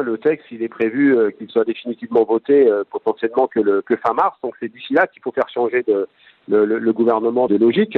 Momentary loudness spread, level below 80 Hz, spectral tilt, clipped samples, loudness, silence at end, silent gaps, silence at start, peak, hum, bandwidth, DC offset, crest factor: 8 LU; -66 dBFS; -8.5 dB/octave; under 0.1%; -18 LUFS; 0 s; none; 0 s; -4 dBFS; none; 4.4 kHz; under 0.1%; 14 dB